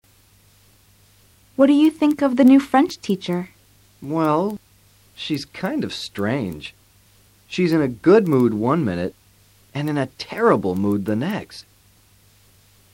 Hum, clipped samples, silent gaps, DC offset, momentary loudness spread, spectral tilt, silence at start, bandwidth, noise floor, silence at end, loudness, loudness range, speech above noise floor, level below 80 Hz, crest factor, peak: none; under 0.1%; none; under 0.1%; 18 LU; -7 dB/octave; 1.6 s; 16.5 kHz; -55 dBFS; 1.35 s; -20 LUFS; 7 LU; 36 dB; -58 dBFS; 18 dB; -4 dBFS